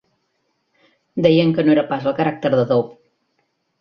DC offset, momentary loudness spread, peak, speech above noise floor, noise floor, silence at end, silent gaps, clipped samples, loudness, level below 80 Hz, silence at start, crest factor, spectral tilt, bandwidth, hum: under 0.1%; 7 LU; -2 dBFS; 53 dB; -69 dBFS; 0.85 s; none; under 0.1%; -17 LUFS; -58 dBFS; 1.15 s; 18 dB; -8.5 dB/octave; 6.6 kHz; none